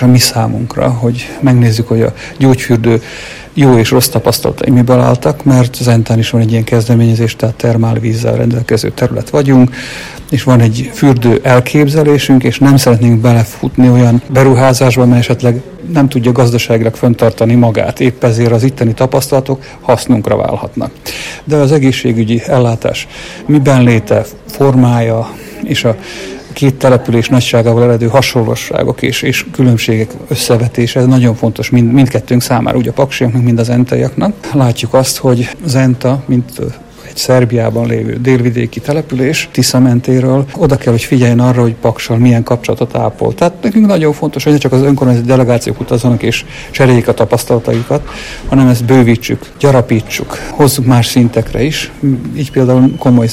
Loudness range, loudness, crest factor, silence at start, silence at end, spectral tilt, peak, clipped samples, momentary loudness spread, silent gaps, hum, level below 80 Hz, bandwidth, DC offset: 4 LU; -10 LUFS; 10 dB; 0 s; 0 s; -6.5 dB/octave; 0 dBFS; 2%; 8 LU; none; none; -36 dBFS; 15.5 kHz; under 0.1%